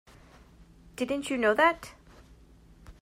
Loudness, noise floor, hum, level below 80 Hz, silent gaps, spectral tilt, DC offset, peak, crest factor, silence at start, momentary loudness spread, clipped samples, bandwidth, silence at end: -27 LUFS; -55 dBFS; none; -56 dBFS; none; -4 dB/octave; under 0.1%; -12 dBFS; 20 dB; 1 s; 23 LU; under 0.1%; 16 kHz; 0.1 s